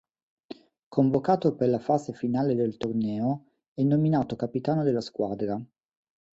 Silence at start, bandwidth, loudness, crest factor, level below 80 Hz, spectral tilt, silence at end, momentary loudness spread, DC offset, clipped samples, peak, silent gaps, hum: 0.5 s; 7.8 kHz; -27 LUFS; 20 dB; -64 dBFS; -9 dB/octave; 0.65 s; 12 LU; under 0.1%; under 0.1%; -8 dBFS; 0.83-0.91 s, 3.68-3.75 s; none